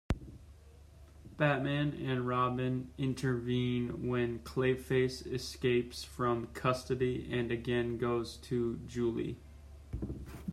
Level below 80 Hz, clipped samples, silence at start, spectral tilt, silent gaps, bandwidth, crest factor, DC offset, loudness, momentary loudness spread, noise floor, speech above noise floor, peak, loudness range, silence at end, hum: -52 dBFS; under 0.1%; 0.1 s; -6.5 dB/octave; none; 14 kHz; 20 dB; under 0.1%; -35 LUFS; 10 LU; -56 dBFS; 22 dB; -16 dBFS; 2 LU; 0 s; none